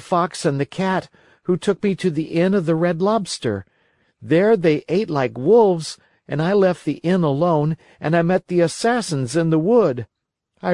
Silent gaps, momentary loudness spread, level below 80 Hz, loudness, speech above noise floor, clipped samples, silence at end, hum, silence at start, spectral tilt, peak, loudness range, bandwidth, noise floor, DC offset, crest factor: none; 10 LU; -60 dBFS; -19 LUFS; 50 dB; under 0.1%; 0 s; none; 0 s; -6.5 dB/octave; -4 dBFS; 2 LU; 11.5 kHz; -68 dBFS; under 0.1%; 16 dB